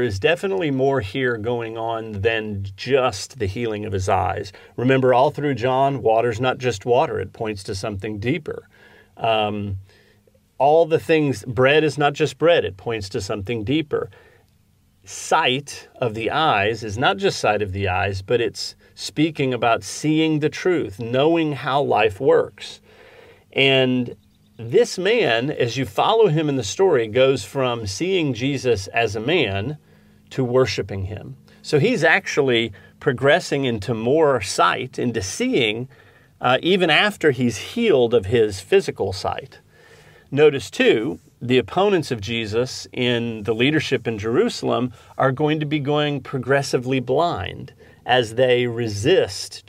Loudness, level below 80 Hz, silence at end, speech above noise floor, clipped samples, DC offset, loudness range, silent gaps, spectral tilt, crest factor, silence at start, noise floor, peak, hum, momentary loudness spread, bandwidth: -20 LUFS; -56 dBFS; 0.1 s; 39 dB; under 0.1%; under 0.1%; 4 LU; none; -5 dB/octave; 18 dB; 0 s; -59 dBFS; -2 dBFS; none; 11 LU; 15.5 kHz